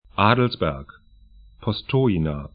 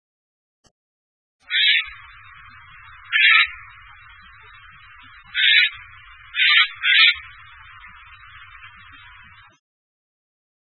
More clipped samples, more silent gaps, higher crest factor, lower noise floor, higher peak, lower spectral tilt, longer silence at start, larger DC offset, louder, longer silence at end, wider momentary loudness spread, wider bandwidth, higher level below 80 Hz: neither; neither; about the same, 22 dB vs 22 dB; about the same, -50 dBFS vs -47 dBFS; about the same, -2 dBFS vs -2 dBFS; first, -11.5 dB/octave vs 0 dB/octave; second, 0.15 s vs 1.5 s; neither; second, -22 LUFS vs -15 LUFS; second, 0.05 s vs 2 s; second, 11 LU vs 16 LU; first, 5 kHz vs 4.5 kHz; first, -42 dBFS vs -58 dBFS